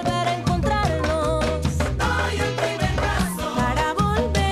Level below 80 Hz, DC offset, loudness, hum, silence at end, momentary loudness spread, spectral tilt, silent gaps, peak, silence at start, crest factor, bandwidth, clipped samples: -30 dBFS; under 0.1%; -22 LUFS; none; 0 s; 2 LU; -5.5 dB/octave; none; -8 dBFS; 0 s; 12 dB; 15.5 kHz; under 0.1%